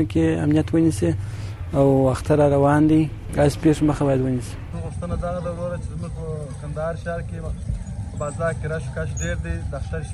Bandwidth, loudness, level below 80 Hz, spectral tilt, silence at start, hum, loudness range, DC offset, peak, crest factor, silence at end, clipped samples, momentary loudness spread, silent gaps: 12.5 kHz; -22 LUFS; -34 dBFS; -7.5 dB/octave; 0 s; none; 10 LU; under 0.1%; -8 dBFS; 14 dB; 0 s; under 0.1%; 14 LU; none